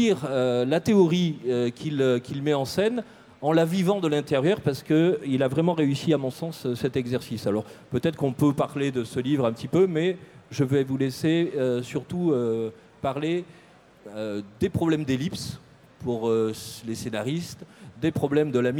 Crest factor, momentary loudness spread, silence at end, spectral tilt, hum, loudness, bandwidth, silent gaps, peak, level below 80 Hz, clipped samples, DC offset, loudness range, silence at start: 16 dB; 10 LU; 0 s; -6.5 dB/octave; none; -25 LUFS; 17.5 kHz; none; -8 dBFS; -60 dBFS; under 0.1%; under 0.1%; 5 LU; 0 s